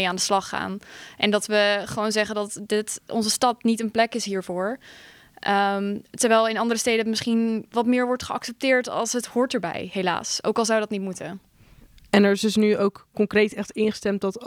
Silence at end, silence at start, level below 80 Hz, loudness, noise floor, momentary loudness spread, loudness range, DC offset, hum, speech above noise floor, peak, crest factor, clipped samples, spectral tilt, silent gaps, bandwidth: 0 s; 0 s; -62 dBFS; -23 LUFS; -52 dBFS; 10 LU; 2 LU; under 0.1%; none; 29 dB; -4 dBFS; 20 dB; under 0.1%; -3.5 dB/octave; none; 16.5 kHz